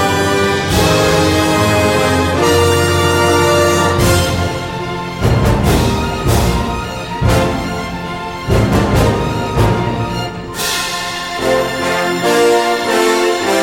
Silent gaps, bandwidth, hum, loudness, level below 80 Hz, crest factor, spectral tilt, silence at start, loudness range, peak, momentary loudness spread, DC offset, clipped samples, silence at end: none; 17 kHz; none; -14 LUFS; -26 dBFS; 12 dB; -5 dB/octave; 0 s; 4 LU; 0 dBFS; 9 LU; under 0.1%; under 0.1%; 0 s